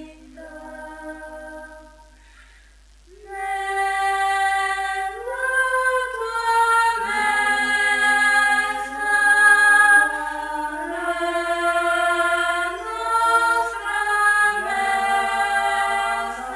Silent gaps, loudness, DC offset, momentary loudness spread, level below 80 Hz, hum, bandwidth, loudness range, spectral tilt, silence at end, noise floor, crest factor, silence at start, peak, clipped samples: none; -19 LUFS; under 0.1%; 16 LU; -50 dBFS; none; 11 kHz; 9 LU; -0.5 dB/octave; 0 s; -50 dBFS; 16 dB; 0 s; -4 dBFS; under 0.1%